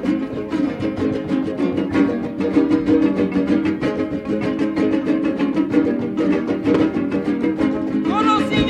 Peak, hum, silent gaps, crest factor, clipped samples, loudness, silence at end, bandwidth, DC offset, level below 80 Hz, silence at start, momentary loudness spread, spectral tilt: -4 dBFS; none; none; 14 dB; under 0.1%; -19 LUFS; 0 s; 9.2 kHz; under 0.1%; -46 dBFS; 0 s; 5 LU; -7.5 dB/octave